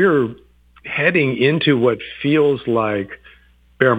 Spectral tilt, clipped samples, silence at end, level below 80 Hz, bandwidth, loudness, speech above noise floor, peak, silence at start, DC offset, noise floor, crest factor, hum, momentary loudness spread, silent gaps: -8.5 dB/octave; under 0.1%; 0 s; -54 dBFS; 8 kHz; -17 LUFS; 34 dB; 0 dBFS; 0 s; under 0.1%; -51 dBFS; 18 dB; 60 Hz at -45 dBFS; 10 LU; none